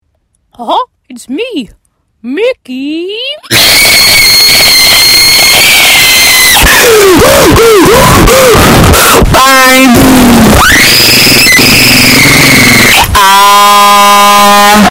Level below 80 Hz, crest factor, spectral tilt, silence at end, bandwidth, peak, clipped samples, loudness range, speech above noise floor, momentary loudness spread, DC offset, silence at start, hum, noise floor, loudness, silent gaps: -20 dBFS; 4 dB; -2.5 dB/octave; 0 s; over 20 kHz; 0 dBFS; 10%; 6 LU; 52 dB; 14 LU; under 0.1%; 0.6 s; none; -56 dBFS; -1 LUFS; none